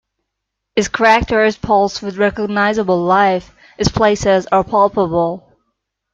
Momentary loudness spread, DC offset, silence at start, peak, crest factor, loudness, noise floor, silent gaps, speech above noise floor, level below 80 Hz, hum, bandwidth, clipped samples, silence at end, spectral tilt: 7 LU; under 0.1%; 0.75 s; 0 dBFS; 16 dB; -15 LUFS; -77 dBFS; none; 63 dB; -38 dBFS; none; 8.8 kHz; under 0.1%; 0.75 s; -5 dB/octave